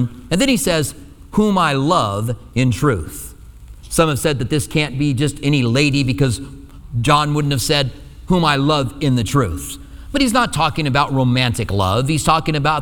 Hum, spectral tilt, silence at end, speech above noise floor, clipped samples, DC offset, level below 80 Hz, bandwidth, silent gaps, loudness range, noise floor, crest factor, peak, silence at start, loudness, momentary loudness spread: none; -5 dB/octave; 0 s; 21 dB; under 0.1%; under 0.1%; -36 dBFS; 19 kHz; none; 2 LU; -38 dBFS; 16 dB; 0 dBFS; 0 s; -17 LUFS; 9 LU